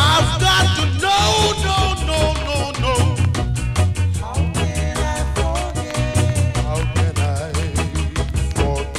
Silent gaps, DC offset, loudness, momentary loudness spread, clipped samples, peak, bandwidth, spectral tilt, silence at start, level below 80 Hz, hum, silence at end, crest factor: none; under 0.1%; -19 LUFS; 7 LU; under 0.1%; -6 dBFS; 14 kHz; -4.5 dB/octave; 0 s; -26 dBFS; none; 0 s; 12 dB